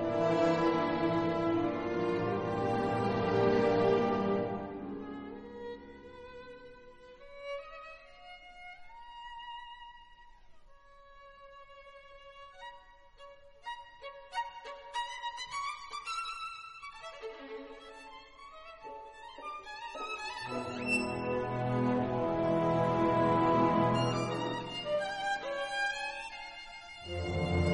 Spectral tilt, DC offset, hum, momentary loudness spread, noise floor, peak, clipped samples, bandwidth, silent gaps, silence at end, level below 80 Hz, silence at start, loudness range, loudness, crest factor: -6 dB/octave; under 0.1%; none; 23 LU; -56 dBFS; -16 dBFS; under 0.1%; 11 kHz; none; 0 s; -58 dBFS; 0 s; 20 LU; -33 LUFS; 20 dB